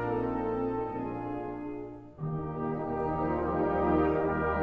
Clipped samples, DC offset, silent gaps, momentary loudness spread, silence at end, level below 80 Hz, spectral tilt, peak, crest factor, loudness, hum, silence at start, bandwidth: under 0.1%; under 0.1%; none; 12 LU; 0 s; -48 dBFS; -10.5 dB/octave; -16 dBFS; 14 dB; -31 LUFS; none; 0 s; 5.2 kHz